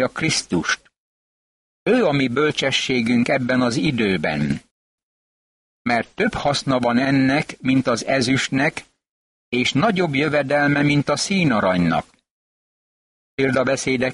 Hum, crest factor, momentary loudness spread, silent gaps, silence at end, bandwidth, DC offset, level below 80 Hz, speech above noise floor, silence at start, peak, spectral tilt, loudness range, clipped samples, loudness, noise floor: none; 14 dB; 6 LU; 0.98-1.86 s, 4.71-5.85 s, 9.09-9.52 s, 12.31-13.38 s; 0 s; 11.5 kHz; under 0.1%; -50 dBFS; over 71 dB; 0 s; -6 dBFS; -5 dB/octave; 3 LU; under 0.1%; -19 LUFS; under -90 dBFS